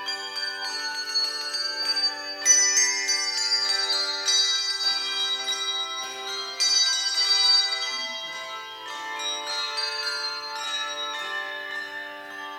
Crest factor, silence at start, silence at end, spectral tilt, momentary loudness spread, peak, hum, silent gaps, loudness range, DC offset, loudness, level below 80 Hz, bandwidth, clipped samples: 20 dB; 0 s; 0 s; 3.5 dB/octave; 14 LU; -6 dBFS; 60 Hz at -75 dBFS; none; 8 LU; under 0.1%; -23 LUFS; -78 dBFS; 16 kHz; under 0.1%